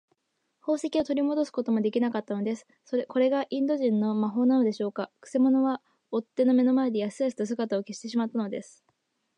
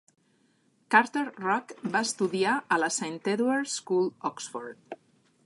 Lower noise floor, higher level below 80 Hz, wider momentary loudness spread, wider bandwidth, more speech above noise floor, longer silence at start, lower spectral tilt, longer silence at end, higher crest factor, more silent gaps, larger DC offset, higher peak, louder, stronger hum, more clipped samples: first, -76 dBFS vs -68 dBFS; first, -74 dBFS vs -82 dBFS; second, 10 LU vs 16 LU; second, 9.8 kHz vs 11.5 kHz; first, 50 dB vs 40 dB; second, 0.65 s vs 0.9 s; first, -6.5 dB/octave vs -3.5 dB/octave; first, 0.75 s vs 0.5 s; second, 14 dB vs 24 dB; neither; neither; second, -14 dBFS vs -6 dBFS; about the same, -27 LUFS vs -28 LUFS; neither; neither